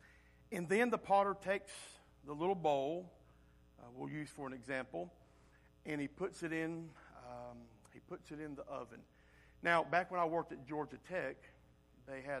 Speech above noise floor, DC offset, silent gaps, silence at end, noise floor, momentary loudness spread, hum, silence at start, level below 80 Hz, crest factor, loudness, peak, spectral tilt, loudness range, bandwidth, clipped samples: 27 dB; under 0.1%; none; 0 s; -67 dBFS; 21 LU; none; 0.05 s; -70 dBFS; 22 dB; -40 LUFS; -18 dBFS; -5.5 dB/octave; 9 LU; 13.5 kHz; under 0.1%